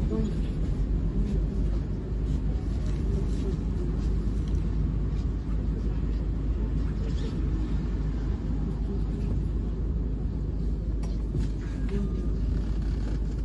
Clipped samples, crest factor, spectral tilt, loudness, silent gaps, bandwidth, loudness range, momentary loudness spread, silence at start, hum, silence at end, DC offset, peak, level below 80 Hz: under 0.1%; 12 dB; -9 dB/octave; -30 LUFS; none; 7.4 kHz; 1 LU; 2 LU; 0 s; none; 0 s; under 0.1%; -16 dBFS; -28 dBFS